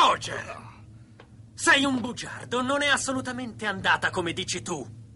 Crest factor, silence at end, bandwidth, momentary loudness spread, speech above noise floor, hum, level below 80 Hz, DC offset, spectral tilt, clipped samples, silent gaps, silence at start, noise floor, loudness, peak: 18 dB; 0 s; 11.5 kHz; 15 LU; 23 dB; none; -56 dBFS; under 0.1%; -2.5 dB/octave; under 0.1%; none; 0 s; -50 dBFS; -26 LUFS; -8 dBFS